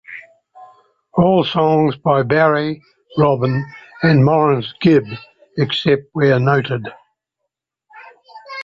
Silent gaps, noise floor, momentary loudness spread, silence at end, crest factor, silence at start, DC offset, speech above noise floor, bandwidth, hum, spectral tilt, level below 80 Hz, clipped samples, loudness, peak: none; -78 dBFS; 18 LU; 0 s; 14 dB; 0.1 s; under 0.1%; 63 dB; 7 kHz; none; -8.5 dB/octave; -52 dBFS; under 0.1%; -16 LUFS; -2 dBFS